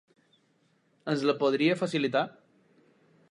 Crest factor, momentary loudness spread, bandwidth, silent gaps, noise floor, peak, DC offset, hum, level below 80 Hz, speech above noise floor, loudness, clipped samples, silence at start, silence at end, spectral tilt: 20 dB; 10 LU; 11 kHz; none; -69 dBFS; -12 dBFS; under 0.1%; none; -82 dBFS; 42 dB; -28 LUFS; under 0.1%; 1.05 s; 1 s; -6 dB/octave